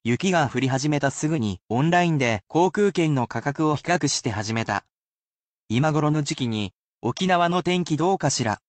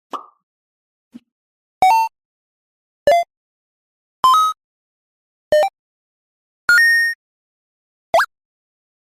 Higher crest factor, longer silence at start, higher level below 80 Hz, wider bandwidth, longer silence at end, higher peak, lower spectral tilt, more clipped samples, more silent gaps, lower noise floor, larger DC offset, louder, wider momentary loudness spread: about the same, 16 dB vs 16 dB; about the same, 0.05 s vs 0.15 s; about the same, -58 dBFS vs -58 dBFS; second, 9 kHz vs 15.5 kHz; second, 0.1 s vs 0.85 s; second, -8 dBFS vs -4 dBFS; first, -5 dB/octave vs -1 dB/octave; neither; second, 1.63-1.67 s, 4.91-5.68 s, 6.78-6.98 s vs 0.43-1.11 s, 1.32-1.81 s, 2.25-3.06 s, 3.37-4.23 s, 4.64-5.51 s, 5.79-6.68 s, 7.15-8.13 s; about the same, under -90 dBFS vs under -90 dBFS; neither; second, -23 LUFS vs -16 LUFS; second, 7 LU vs 18 LU